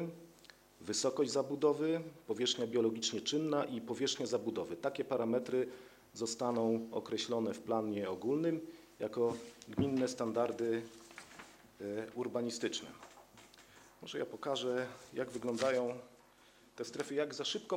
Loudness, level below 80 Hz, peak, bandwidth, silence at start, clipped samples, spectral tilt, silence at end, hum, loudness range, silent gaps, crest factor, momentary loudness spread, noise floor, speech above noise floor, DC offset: -37 LUFS; -74 dBFS; -18 dBFS; 16 kHz; 0 s; under 0.1%; -4 dB/octave; 0 s; none; 6 LU; none; 20 dB; 18 LU; -64 dBFS; 28 dB; under 0.1%